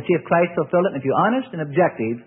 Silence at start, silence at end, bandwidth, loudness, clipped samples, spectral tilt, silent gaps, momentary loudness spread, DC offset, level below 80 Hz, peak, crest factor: 0 s; 0.05 s; 3.7 kHz; -20 LUFS; under 0.1%; -12 dB/octave; none; 3 LU; under 0.1%; -64 dBFS; -4 dBFS; 16 dB